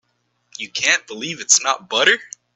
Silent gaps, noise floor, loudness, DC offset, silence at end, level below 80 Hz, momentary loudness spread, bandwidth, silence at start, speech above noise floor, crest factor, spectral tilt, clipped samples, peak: none; -68 dBFS; -17 LUFS; under 0.1%; 0.3 s; -72 dBFS; 13 LU; 10.5 kHz; 0.6 s; 49 dB; 20 dB; 0.5 dB/octave; under 0.1%; 0 dBFS